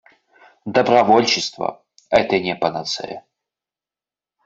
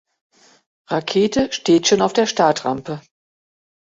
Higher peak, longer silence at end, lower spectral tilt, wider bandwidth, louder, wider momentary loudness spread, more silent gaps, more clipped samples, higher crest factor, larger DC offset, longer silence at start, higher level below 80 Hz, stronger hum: about the same, 0 dBFS vs -2 dBFS; first, 1.25 s vs 0.95 s; about the same, -4 dB/octave vs -4 dB/octave; about the same, 8 kHz vs 8 kHz; about the same, -18 LUFS vs -18 LUFS; first, 15 LU vs 12 LU; neither; neither; about the same, 20 dB vs 18 dB; neither; second, 0.65 s vs 0.9 s; about the same, -58 dBFS vs -56 dBFS; neither